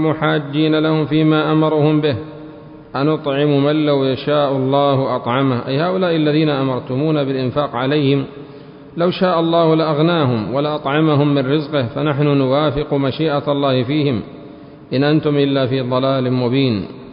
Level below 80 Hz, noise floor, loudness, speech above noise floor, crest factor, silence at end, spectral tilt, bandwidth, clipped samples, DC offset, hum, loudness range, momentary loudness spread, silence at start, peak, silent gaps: -50 dBFS; -37 dBFS; -16 LUFS; 21 dB; 14 dB; 0 s; -12.5 dB/octave; 5.4 kHz; under 0.1%; under 0.1%; none; 2 LU; 6 LU; 0 s; -2 dBFS; none